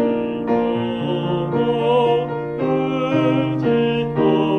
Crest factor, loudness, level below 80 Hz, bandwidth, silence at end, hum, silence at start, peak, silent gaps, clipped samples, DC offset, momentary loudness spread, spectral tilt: 14 dB; -19 LUFS; -50 dBFS; 6.6 kHz; 0 s; none; 0 s; -4 dBFS; none; under 0.1%; under 0.1%; 5 LU; -8.5 dB/octave